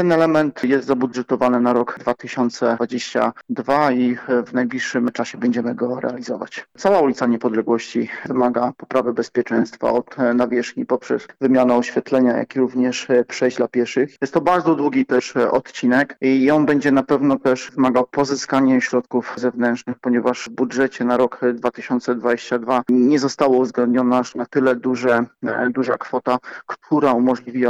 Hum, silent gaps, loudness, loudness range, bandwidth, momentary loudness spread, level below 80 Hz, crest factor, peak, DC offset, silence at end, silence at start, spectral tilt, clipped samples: none; none; -19 LUFS; 3 LU; 8 kHz; 7 LU; -62 dBFS; 12 dB; -6 dBFS; under 0.1%; 0 s; 0 s; -5.5 dB/octave; under 0.1%